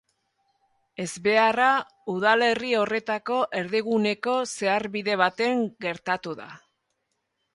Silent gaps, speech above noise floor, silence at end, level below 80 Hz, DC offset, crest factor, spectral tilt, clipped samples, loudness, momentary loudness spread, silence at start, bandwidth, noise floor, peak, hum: none; 53 dB; 1 s; -70 dBFS; under 0.1%; 22 dB; -4 dB/octave; under 0.1%; -24 LUFS; 12 LU; 1 s; 11.5 kHz; -77 dBFS; -4 dBFS; none